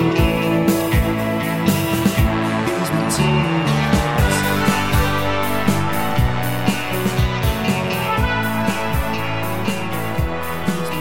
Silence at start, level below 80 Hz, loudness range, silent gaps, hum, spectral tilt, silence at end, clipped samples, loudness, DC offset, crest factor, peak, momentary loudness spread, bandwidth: 0 s; -28 dBFS; 3 LU; none; none; -5.5 dB/octave; 0 s; under 0.1%; -19 LUFS; 1%; 14 dB; -4 dBFS; 5 LU; 17 kHz